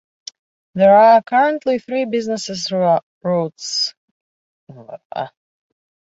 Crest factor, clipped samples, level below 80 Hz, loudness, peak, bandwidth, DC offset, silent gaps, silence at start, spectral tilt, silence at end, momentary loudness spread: 16 dB; under 0.1%; -64 dBFS; -16 LUFS; -2 dBFS; 8 kHz; under 0.1%; 3.03-3.21 s, 3.97-4.67 s, 5.05-5.10 s; 0.75 s; -4.5 dB/octave; 0.85 s; 24 LU